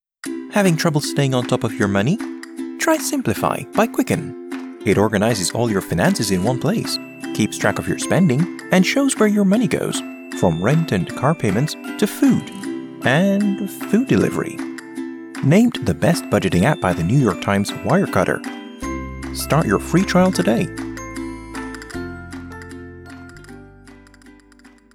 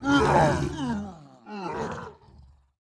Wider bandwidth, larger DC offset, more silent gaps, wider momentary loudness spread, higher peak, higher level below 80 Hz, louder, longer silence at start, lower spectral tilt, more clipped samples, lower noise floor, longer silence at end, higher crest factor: first, 18 kHz vs 11 kHz; neither; neither; second, 14 LU vs 20 LU; first, -2 dBFS vs -6 dBFS; about the same, -46 dBFS vs -44 dBFS; first, -19 LUFS vs -26 LUFS; first, 0.25 s vs 0 s; about the same, -5.5 dB/octave vs -6 dB/octave; neither; second, -48 dBFS vs -54 dBFS; second, 0.25 s vs 0.75 s; about the same, 18 dB vs 20 dB